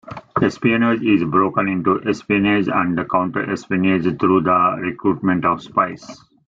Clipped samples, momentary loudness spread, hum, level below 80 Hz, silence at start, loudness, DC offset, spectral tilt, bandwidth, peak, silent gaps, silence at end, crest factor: under 0.1%; 5 LU; none; -54 dBFS; 0.05 s; -18 LUFS; under 0.1%; -7.5 dB/octave; 7.6 kHz; -2 dBFS; none; 0.3 s; 16 dB